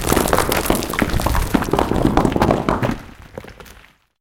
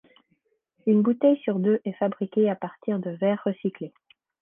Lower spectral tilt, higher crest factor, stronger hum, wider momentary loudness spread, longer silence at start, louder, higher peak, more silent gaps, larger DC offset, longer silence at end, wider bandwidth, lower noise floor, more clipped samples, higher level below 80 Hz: second, -5 dB/octave vs -11.5 dB/octave; about the same, 18 dB vs 16 dB; neither; first, 20 LU vs 10 LU; second, 0 s vs 0.85 s; first, -18 LUFS vs -25 LUFS; first, -2 dBFS vs -8 dBFS; neither; neither; about the same, 0.5 s vs 0.55 s; first, 17 kHz vs 3.6 kHz; second, -47 dBFS vs -71 dBFS; neither; first, -28 dBFS vs -76 dBFS